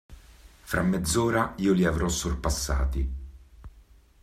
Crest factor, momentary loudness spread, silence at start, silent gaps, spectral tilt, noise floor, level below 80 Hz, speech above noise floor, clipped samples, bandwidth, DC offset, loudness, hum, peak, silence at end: 18 dB; 9 LU; 0.1 s; none; -5 dB/octave; -55 dBFS; -34 dBFS; 30 dB; under 0.1%; 15.5 kHz; under 0.1%; -26 LUFS; none; -10 dBFS; 0.4 s